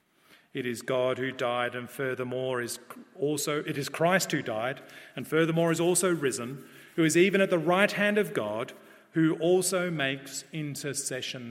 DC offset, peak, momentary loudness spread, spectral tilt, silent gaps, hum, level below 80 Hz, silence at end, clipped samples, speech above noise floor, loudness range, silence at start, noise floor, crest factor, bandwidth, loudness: under 0.1%; -8 dBFS; 13 LU; -4.5 dB/octave; none; none; -76 dBFS; 0 s; under 0.1%; 33 dB; 5 LU; 0.55 s; -61 dBFS; 22 dB; 16.5 kHz; -28 LUFS